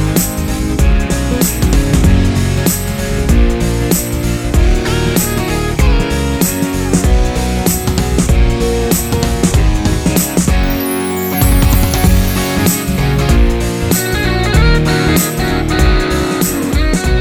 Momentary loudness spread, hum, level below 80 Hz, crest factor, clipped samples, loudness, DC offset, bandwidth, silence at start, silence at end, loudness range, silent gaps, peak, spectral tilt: 4 LU; none; -16 dBFS; 12 dB; under 0.1%; -13 LUFS; under 0.1%; over 20 kHz; 0 s; 0 s; 1 LU; none; 0 dBFS; -5 dB/octave